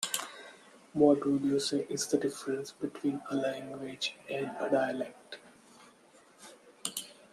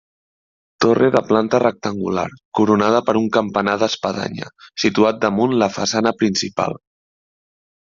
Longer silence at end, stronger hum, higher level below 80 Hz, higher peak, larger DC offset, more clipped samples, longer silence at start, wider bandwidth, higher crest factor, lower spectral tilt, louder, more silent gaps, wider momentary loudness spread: second, 0.2 s vs 1.05 s; neither; second, -76 dBFS vs -58 dBFS; second, -10 dBFS vs -2 dBFS; neither; neither; second, 0 s vs 0.8 s; first, 13.5 kHz vs 7.6 kHz; first, 22 dB vs 16 dB; about the same, -4 dB/octave vs -5 dB/octave; second, -33 LUFS vs -18 LUFS; second, none vs 2.45-2.52 s; first, 22 LU vs 9 LU